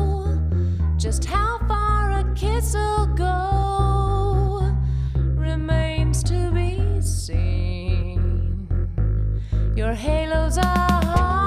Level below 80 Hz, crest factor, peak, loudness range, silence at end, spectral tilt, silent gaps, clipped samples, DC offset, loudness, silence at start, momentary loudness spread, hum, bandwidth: -24 dBFS; 16 dB; -4 dBFS; 2 LU; 0 s; -6 dB/octave; none; under 0.1%; under 0.1%; -22 LUFS; 0 s; 4 LU; none; 14.5 kHz